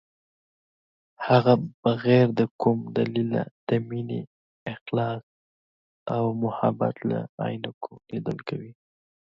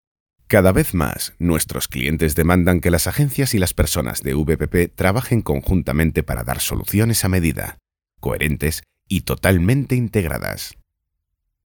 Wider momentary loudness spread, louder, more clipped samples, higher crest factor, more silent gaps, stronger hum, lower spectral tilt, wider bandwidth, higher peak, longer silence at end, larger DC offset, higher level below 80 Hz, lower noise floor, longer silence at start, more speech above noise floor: first, 17 LU vs 9 LU; second, -26 LUFS vs -19 LUFS; neither; about the same, 20 dB vs 18 dB; first, 1.74-1.83 s, 2.51-2.59 s, 3.51-3.67 s, 4.27-4.66 s, 4.81-4.86 s, 5.23-6.06 s, 7.29-7.38 s, 7.74-7.81 s vs none; neither; first, -9.5 dB/octave vs -5.5 dB/octave; second, 6 kHz vs over 20 kHz; second, -6 dBFS vs -2 dBFS; second, 0.65 s vs 1 s; neither; second, -66 dBFS vs -32 dBFS; first, under -90 dBFS vs -77 dBFS; first, 1.2 s vs 0.5 s; first, over 65 dB vs 58 dB